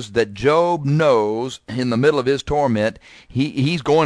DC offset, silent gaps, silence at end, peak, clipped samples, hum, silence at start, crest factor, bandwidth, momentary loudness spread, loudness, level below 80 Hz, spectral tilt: under 0.1%; none; 0 s; -2 dBFS; under 0.1%; none; 0 s; 16 dB; 11 kHz; 8 LU; -19 LUFS; -44 dBFS; -6.5 dB/octave